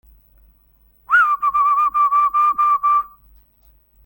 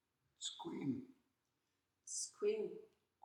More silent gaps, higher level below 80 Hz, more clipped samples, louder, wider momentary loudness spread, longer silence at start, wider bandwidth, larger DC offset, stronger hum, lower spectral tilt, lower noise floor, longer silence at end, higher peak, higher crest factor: neither; first, -54 dBFS vs under -90 dBFS; neither; first, -16 LUFS vs -44 LUFS; second, 3 LU vs 17 LU; first, 1.1 s vs 0.4 s; first, 17 kHz vs 13 kHz; neither; neither; second, -1.5 dB/octave vs -3.5 dB/octave; second, -56 dBFS vs -87 dBFS; first, 1 s vs 0.4 s; first, -4 dBFS vs -28 dBFS; about the same, 14 dB vs 18 dB